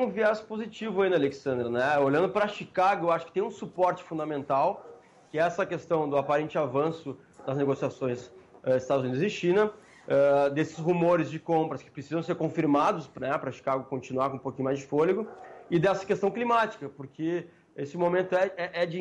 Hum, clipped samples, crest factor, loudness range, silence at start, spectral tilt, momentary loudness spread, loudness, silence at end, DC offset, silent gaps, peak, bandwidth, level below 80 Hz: none; under 0.1%; 14 dB; 3 LU; 0 s; -6.5 dB/octave; 10 LU; -28 LUFS; 0 s; under 0.1%; none; -14 dBFS; 10.5 kHz; -68 dBFS